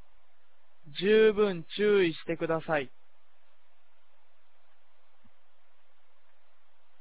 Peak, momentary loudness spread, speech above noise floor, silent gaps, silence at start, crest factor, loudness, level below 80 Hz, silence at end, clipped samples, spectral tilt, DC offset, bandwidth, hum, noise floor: -12 dBFS; 11 LU; 45 dB; none; 0.85 s; 20 dB; -27 LUFS; -66 dBFS; 4.15 s; under 0.1%; -9 dB/octave; 0.8%; 4 kHz; 50 Hz at -70 dBFS; -71 dBFS